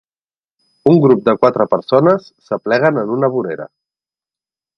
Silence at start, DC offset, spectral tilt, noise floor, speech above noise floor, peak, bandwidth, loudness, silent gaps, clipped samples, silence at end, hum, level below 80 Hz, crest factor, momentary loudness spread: 0.85 s; under 0.1%; -9 dB/octave; under -90 dBFS; over 77 dB; 0 dBFS; 6.4 kHz; -14 LUFS; none; under 0.1%; 1.1 s; none; -60 dBFS; 16 dB; 13 LU